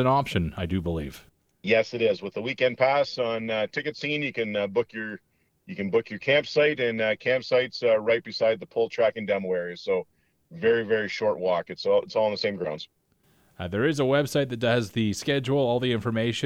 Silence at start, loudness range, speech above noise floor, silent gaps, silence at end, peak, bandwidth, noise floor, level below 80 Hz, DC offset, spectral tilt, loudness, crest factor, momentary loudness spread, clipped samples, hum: 0 s; 3 LU; 39 dB; none; 0 s; -10 dBFS; 15 kHz; -64 dBFS; -54 dBFS; under 0.1%; -5.5 dB/octave; -26 LUFS; 16 dB; 9 LU; under 0.1%; none